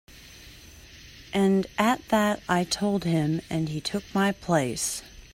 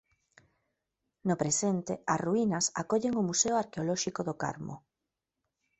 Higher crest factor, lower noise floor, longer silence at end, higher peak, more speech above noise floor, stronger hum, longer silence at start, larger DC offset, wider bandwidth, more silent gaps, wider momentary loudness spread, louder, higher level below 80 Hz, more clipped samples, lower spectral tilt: about the same, 20 dB vs 20 dB; second, -48 dBFS vs -87 dBFS; second, 0.1 s vs 1 s; first, -8 dBFS vs -14 dBFS; second, 23 dB vs 57 dB; neither; second, 0.15 s vs 1.25 s; neither; first, 16 kHz vs 8.4 kHz; neither; first, 22 LU vs 9 LU; first, -26 LUFS vs -31 LUFS; first, -54 dBFS vs -68 dBFS; neither; about the same, -5 dB/octave vs -4 dB/octave